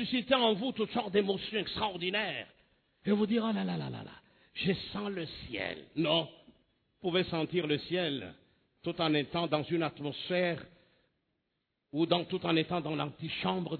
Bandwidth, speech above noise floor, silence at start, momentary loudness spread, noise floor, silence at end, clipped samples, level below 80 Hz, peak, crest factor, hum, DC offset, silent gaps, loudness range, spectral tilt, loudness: 4.6 kHz; 50 dB; 0 s; 11 LU; -83 dBFS; 0 s; under 0.1%; -66 dBFS; -12 dBFS; 22 dB; none; under 0.1%; none; 2 LU; -8.5 dB/octave; -33 LUFS